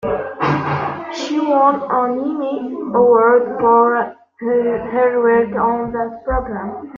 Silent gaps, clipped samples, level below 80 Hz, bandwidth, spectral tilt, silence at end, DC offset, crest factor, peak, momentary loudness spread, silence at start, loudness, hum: none; under 0.1%; -40 dBFS; 7.4 kHz; -7 dB/octave; 0 s; under 0.1%; 14 dB; -2 dBFS; 11 LU; 0 s; -17 LUFS; none